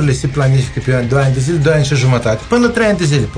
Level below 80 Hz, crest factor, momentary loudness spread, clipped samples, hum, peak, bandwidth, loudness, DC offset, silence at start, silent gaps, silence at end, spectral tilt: -32 dBFS; 12 dB; 3 LU; under 0.1%; none; 0 dBFS; 10 kHz; -13 LUFS; under 0.1%; 0 s; none; 0 s; -6 dB/octave